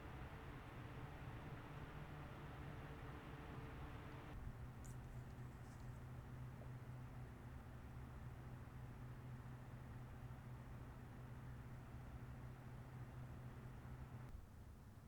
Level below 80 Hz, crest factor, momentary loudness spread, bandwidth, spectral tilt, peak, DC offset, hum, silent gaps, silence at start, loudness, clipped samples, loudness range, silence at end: -62 dBFS; 14 dB; 2 LU; over 20 kHz; -7 dB/octave; -40 dBFS; under 0.1%; none; none; 0 s; -56 LUFS; under 0.1%; 2 LU; 0 s